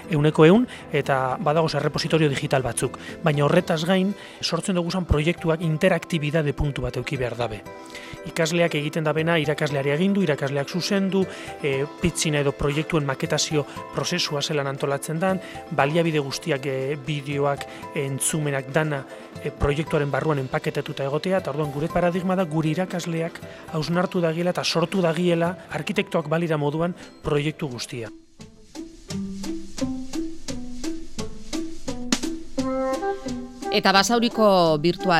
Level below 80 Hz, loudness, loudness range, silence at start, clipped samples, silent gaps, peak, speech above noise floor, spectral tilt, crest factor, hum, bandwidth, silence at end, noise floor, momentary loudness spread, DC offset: -42 dBFS; -24 LUFS; 7 LU; 0 s; under 0.1%; none; -2 dBFS; 23 dB; -5 dB/octave; 22 dB; none; 15.5 kHz; 0 s; -46 dBFS; 12 LU; under 0.1%